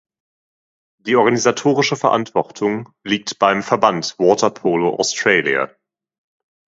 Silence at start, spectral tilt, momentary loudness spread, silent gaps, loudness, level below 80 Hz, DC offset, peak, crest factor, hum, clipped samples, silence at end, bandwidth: 1.05 s; -4 dB/octave; 7 LU; none; -17 LUFS; -62 dBFS; under 0.1%; 0 dBFS; 18 dB; none; under 0.1%; 1 s; 8 kHz